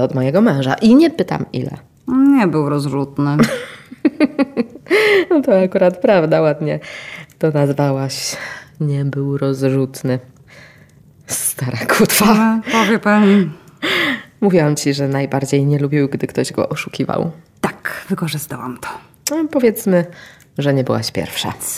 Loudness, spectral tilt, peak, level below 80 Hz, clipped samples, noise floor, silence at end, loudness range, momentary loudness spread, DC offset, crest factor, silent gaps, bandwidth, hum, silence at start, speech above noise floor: -16 LUFS; -5.5 dB/octave; -2 dBFS; -54 dBFS; under 0.1%; -46 dBFS; 0 s; 6 LU; 13 LU; under 0.1%; 14 dB; none; 16.5 kHz; none; 0 s; 30 dB